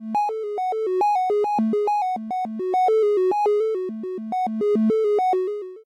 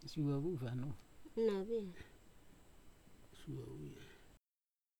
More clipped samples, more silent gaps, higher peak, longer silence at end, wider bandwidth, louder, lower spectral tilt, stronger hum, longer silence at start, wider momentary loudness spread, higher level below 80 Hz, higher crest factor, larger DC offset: neither; neither; first, -14 dBFS vs -26 dBFS; second, 0.05 s vs 0.65 s; second, 9.6 kHz vs 19.5 kHz; first, -22 LUFS vs -43 LUFS; about the same, -7 dB/octave vs -8 dB/octave; neither; about the same, 0 s vs 0 s; second, 8 LU vs 21 LU; second, -76 dBFS vs -66 dBFS; second, 8 dB vs 20 dB; neither